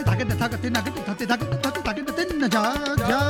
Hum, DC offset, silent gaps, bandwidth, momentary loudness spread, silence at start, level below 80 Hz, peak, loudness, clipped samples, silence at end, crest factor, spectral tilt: none; under 0.1%; none; 18.5 kHz; 5 LU; 0 s; -42 dBFS; -6 dBFS; -24 LUFS; under 0.1%; 0 s; 18 dB; -5.5 dB/octave